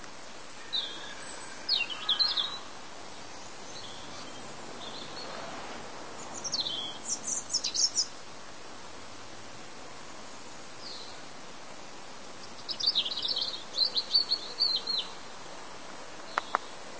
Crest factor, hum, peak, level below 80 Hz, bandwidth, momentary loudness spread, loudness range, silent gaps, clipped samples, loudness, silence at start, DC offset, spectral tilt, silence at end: 28 dB; none; -8 dBFS; -68 dBFS; 8 kHz; 19 LU; 16 LU; none; under 0.1%; -31 LUFS; 0 s; 0.6%; 0 dB/octave; 0 s